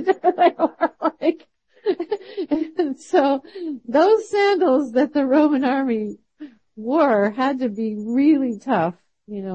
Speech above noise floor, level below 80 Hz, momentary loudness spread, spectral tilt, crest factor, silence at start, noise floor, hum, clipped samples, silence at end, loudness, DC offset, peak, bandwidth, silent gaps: 33 dB; -68 dBFS; 12 LU; -6.5 dB/octave; 14 dB; 0 s; -52 dBFS; none; under 0.1%; 0 s; -20 LUFS; under 0.1%; -6 dBFS; 8.6 kHz; none